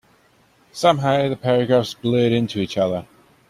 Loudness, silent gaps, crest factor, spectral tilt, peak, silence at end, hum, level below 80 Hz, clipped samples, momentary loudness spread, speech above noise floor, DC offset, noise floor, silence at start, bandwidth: -20 LUFS; none; 18 dB; -6.5 dB/octave; -2 dBFS; 0.45 s; none; -58 dBFS; under 0.1%; 6 LU; 38 dB; under 0.1%; -57 dBFS; 0.75 s; 14.5 kHz